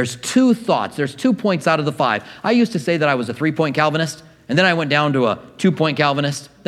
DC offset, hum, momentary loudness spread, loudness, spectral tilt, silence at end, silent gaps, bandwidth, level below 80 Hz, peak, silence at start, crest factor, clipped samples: under 0.1%; none; 6 LU; -18 LUFS; -5.5 dB/octave; 0.2 s; none; 14 kHz; -62 dBFS; 0 dBFS; 0 s; 18 dB; under 0.1%